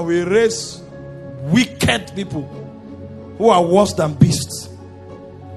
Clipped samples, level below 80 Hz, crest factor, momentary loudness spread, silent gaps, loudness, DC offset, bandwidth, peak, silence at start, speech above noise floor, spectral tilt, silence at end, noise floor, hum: under 0.1%; -48 dBFS; 18 dB; 21 LU; none; -17 LUFS; under 0.1%; 13 kHz; 0 dBFS; 0 s; 20 dB; -5.5 dB/octave; 0 s; -36 dBFS; none